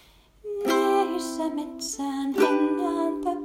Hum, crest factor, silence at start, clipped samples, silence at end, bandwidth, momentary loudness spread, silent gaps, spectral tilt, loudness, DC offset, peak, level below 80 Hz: none; 18 dB; 0.45 s; under 0.1%; 0 s; 16 kHz; 10 LU; none; -3 dB/octave; -25 LUFS; under 0.1%; -8 dBFS; -60 dBFS